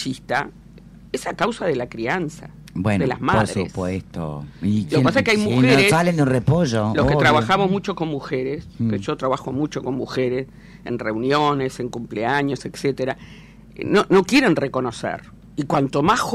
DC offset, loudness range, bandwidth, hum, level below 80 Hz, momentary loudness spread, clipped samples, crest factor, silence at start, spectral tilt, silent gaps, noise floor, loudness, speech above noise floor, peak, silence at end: under 0.1%; 6 LU; 14.5 kHz; none; -44 dBFS; 14 LU; under 0.1%; 14 dB; 0 s; -6 dB/octave; none; -43 dBFS; -20 LUFS; 23 dB; -6 dBFS; 0 s